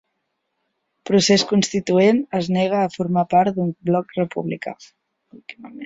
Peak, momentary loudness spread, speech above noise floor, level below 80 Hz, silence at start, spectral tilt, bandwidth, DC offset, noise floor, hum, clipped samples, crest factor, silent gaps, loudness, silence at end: -4 dBFS; 20 LU; 55 dB; -58 dBFS; 1.05 s; -5 dB/octave; 8 kHz; under 0.1%; -74 dBFS; none; under 0.1%; 18 dB; none; -19 LUFS; 0 s